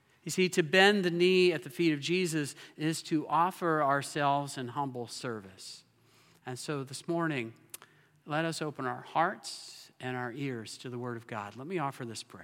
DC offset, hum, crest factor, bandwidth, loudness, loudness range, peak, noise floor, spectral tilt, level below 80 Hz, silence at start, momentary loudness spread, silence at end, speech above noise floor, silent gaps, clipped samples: under 0.1%; none; 24 dB; 16.5 kHz; -31 LUFS; 10 LU; -8 dBFS; -64 dBFS; -4.5 dB/octave; -84 dBFS; 0.25 s; 17 LU; 0 s; 32 dB; none; under 0.1%